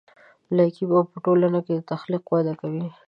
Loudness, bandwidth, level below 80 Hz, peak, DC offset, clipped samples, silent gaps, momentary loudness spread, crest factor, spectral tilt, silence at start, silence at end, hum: -23 LUFS; 5.4 kHz; -72 dBFS; -6 dBFS; under 0.1%; under 0.1%; none; 8 LU; 16 dB; -10.5 dB/octave; 0.5 s; 0.15 s; none